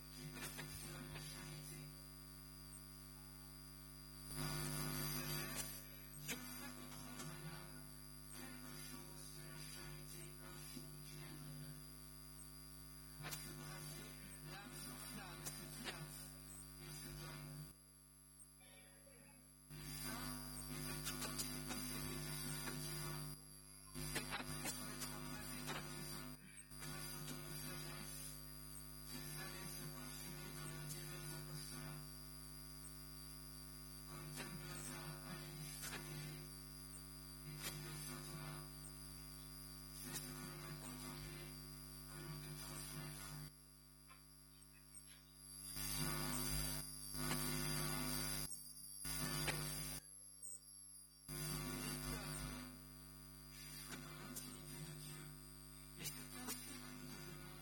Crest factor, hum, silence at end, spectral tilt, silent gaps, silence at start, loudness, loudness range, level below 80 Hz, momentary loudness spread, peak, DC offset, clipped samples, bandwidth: 24 dB; 50 Hz at -60 dBFS; 0 s; -3 dB/octave; none; 0 s; -49 LUFS; 9 LU; -62 dBFS; 12 LU; -26 dBFS; under 0.1%; under 0.1%; 17.5 kHz